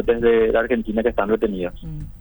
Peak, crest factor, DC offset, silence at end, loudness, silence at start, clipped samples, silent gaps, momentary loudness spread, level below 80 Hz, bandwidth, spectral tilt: -6 dBFS; 14 dB; under 0.1%; 0 s; -20 LUFS; 0 s; under 0.1%; none; 14 LU; -36 dBFS; over 20 kHz; -8.5 dB/octave